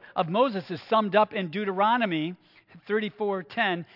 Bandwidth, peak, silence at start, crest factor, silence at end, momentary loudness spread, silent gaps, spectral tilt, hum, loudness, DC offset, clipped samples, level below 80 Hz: 5.8 kHz; -8 dBFS; 0.05 s; 20 dB; 0.1 s; 7 LU; none; -8 dB/octave; none; -26 LUFS; under 0.1%; under 0.1%; -78 dBFS